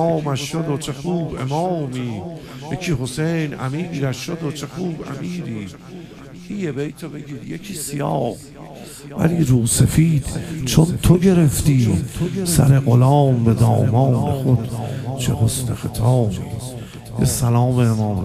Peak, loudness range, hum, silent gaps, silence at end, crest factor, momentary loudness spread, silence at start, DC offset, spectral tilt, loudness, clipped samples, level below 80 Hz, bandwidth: 0 dBFS; 11 LU; none; none; 0 s; 18 dB; 17 LU; 0 s; under 0.1%; -6 dB/octave; -19 LUFS; under 0.1%; -38 dBFS; 15.5 kHz